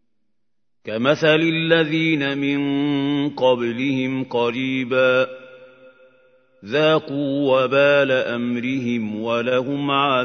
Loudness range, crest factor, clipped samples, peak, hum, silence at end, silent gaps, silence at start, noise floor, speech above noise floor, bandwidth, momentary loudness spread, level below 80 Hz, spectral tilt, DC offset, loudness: 3 LU; 18 dB; under 0.1%; -2 dBFS; none; 0 s; none; 0.85 s; -80 dBFS; 61 dB; 6.6 kHz; 7 LU; -68 dBFS; -6.5 dB/octave; under 0.1%; -19 LUFS